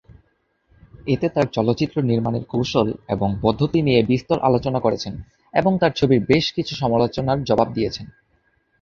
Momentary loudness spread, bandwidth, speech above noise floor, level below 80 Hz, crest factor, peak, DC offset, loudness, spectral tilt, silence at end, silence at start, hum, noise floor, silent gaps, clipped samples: 7 LU; 7.4 kHz; 46 dB; -46 dBFS; 18 dB; -2 dBFS; under 0.1%; -20 LUFS; -7 dB/octave; 0.7 s; 1 s; none; -66 dBFS; none; under 0.1%